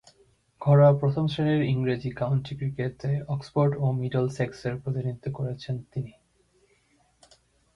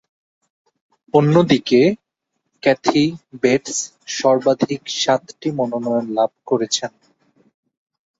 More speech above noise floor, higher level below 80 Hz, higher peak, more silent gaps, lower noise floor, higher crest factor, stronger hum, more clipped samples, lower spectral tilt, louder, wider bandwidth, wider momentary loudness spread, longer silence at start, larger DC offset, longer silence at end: second, 40 dB vs 58 dB; about the same, -58 dBFS vs -60 dBFS; second, -8 dBFS vs -2 dBFS; neither; second, -66 dBFS vs -76 dBFS; about the same, 18 dB vs 18 dB; neither; neither; first, -8.5 dB/octave vs -5 dB/octave; second, -26 LUFS vs -18 LUFS; second, 7.2 kHz vs 8 kHz; first, 13 LU vs 9 LU; second, 0.6 s vs 1.15 s; neither; first, 1.65 s vs 1.3 s